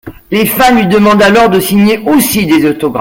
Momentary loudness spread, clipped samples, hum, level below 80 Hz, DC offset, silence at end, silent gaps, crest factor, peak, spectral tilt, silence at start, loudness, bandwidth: 6 LU; under 0.1%; none; -36 dBFS; under 0.1%; 0 s; none; 8 dB; 0 dBFS; -5 dB/octave; 0.05 s; -8 LUFS; 17 kHz